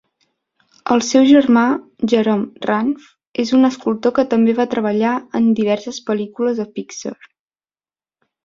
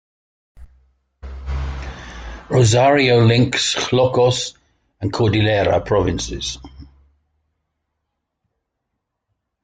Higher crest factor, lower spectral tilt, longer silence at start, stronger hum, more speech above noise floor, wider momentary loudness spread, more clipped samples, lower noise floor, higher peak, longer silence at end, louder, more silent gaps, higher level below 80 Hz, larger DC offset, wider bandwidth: about the same, 16 dB vs 16 dB; about the same, -5 dB/octave vs -5 dB/octave; first, 0.85 s vs 0.6 s; neither; first, over 74 dB vs 61 dB; second, 15 LU vs 21 LU; neither; first, under -90 dBFS vs -77 dBFS; about the same, -2 dBFS vs -2 dBFS; second, 1.3 s vs 2.8 s; about the same, -16 LUFS vs -17 LUFS; first, 3.27-3.32 s vs none; second, -60 dBFS vs -36 dBFS; neither; second, 7.6 kHz vs 9.4 kHz